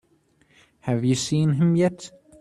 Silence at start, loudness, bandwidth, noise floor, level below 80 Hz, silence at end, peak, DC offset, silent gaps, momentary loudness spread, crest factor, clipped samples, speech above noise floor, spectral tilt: 0.85 s; -22 LUFS; 12 kHz; -62 dBFS; -58 dBFS; 0.3 s; -8 dBFS; under 0.1%; none; 18 LU; 16 dB; under 0.1%; 41 dB; -6.5 dB/octave